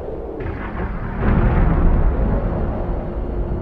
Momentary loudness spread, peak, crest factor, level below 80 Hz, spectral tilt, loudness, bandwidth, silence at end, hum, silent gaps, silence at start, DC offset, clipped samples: 10 LU; -2 dBFS; 16 dB; -20 dBFS; -11 dB/octave; -22 LUFS; 3.8 kHz; 0 s; none; none; 0 s; under 0.1%; under 0.1%